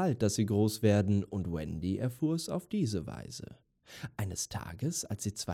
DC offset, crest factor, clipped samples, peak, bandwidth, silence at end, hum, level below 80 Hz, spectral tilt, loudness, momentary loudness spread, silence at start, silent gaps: under 0.1%; 16 dB; under 0.1%; -16 dBFS; 16 kHz; 0 s; none; -60 dBFS; -5.5 dB/octave; -33 LUFS; 16 LU; 0 s; none